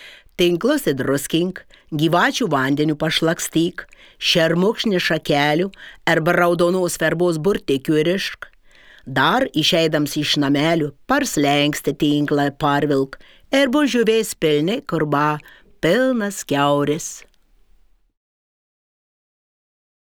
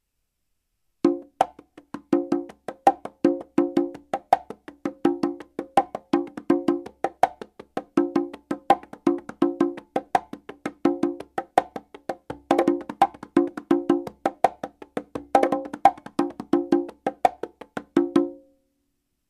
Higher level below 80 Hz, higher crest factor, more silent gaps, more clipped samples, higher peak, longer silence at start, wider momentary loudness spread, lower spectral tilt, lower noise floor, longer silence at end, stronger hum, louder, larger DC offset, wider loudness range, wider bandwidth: first, -50 dBFS vs -64 dBFS; second, 18 dB vs 24 dB; neither; neither; about the same, -2 dBFS vs 0 dBFS; second, 0 s vs 1.05 s; second, 7 LU vs 14 LU; second, -4.5 dB/octave vs -6 dB/octave; second, -54 dBFS vs -76 dBFS; first, 2.85 s vs 0.95 s; neither; first, -19 LUFS vs -25 LUFS; neither; about the same, 4 LU vs 2 LU; first, over 20 kHz vs 12.5 kHz